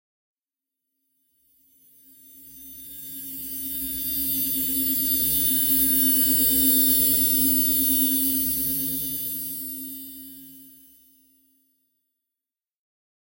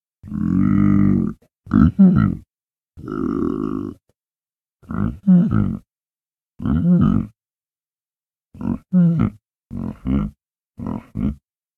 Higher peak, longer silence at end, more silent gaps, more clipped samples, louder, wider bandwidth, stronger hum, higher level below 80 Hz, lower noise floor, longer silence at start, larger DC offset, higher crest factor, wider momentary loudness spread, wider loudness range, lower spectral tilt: second, -6 dBFS vs 0 dBFS; first, 2.65 s vs 0.4 s; second, none vs 2.63-2.68 s, 6.23-6.27 s, 6.42-6.47 s; neither; about the same, -20 LUFS vs -19 LUFS; first, 16.5 kHz vs 3.3 kHz; neither; second, -50 dBFS vs -36 dBFS; about the same, -90 dBFS vs under -90 dBFS; first, 2.35 s vs 0.25 s; neither; about the same, 18 dB vs 20 dB; first, 20 LU vs 16 LU; first, 18 LU vs 5 LU; second, -2 dB/octave vs -11 dB/octave